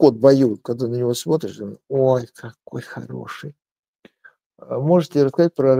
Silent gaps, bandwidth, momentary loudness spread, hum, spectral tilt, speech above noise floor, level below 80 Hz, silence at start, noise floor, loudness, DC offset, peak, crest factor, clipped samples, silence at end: 3.71-3.94 s, 4.46-4.50 s; 16 kHz; 19 LU; none; -7 dB/octave; 34 dB; -66 dBFS; 0 s; -53 dBFS; -19 LUFS; under 0.1%; 0 dBFS; 18 dB; under 0.1%; 0 s